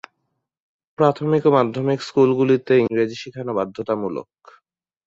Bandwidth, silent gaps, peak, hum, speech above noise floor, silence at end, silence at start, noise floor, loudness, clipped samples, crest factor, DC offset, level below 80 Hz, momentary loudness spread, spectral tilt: 7.8 kHz; none; -2 dBFS; none; 56 dB; 0.85 s; 1 s; -75 dBFS; -19 LUFS; under 0.1%; 18 dB; under 0.1%; -62 dBFS; 9 LU; -7.5 dB/octave